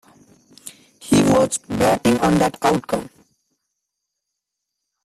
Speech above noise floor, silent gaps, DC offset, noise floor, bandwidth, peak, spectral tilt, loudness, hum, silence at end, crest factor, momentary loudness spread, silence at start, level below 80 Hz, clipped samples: 62 dB; none; under 0.1%; -80 dBFS; 15 kHz; -4 dBFS; -5 dB/octave; -18 LUFS; 50 Hz at -50 dBFS; 2 s; 18 dB; 23 LU; 0.65 s; -48 dBFS; under 0.1%